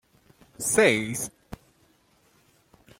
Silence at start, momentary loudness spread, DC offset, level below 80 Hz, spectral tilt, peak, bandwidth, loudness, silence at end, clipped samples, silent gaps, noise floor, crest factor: 0.6 s; 26 LU; under 0.1%; -58 dBFS; -3 dB/octave; -6 dBFS; 16.5 kHz; -24 LUFS; 1.45 s; under 0.1%; none; -63 dBFS; 24 dB